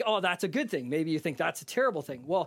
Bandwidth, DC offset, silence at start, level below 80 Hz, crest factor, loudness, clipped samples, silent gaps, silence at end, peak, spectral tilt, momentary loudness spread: 16.5 kHz; under 0.1%; 0 s; -78 dBFS; 16 dB; -30 LUFS; under 0.1%; none; 0 s; -14 dBFS; -4.5 dB/octave; 4 LU